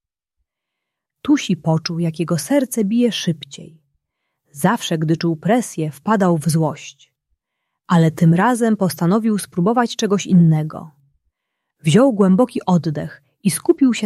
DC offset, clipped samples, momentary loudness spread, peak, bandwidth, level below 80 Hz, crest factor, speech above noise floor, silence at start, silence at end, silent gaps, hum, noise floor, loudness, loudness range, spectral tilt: under 0.1%; under 0.1%; 11 LU; -2 dBFS; 14 kHz; -60 dBFS; 16 dB; 64 dB; 1.25 s; 0 s; none; none; -81 dBFS; -17 LUFS; 4 LU; -6 dB/octave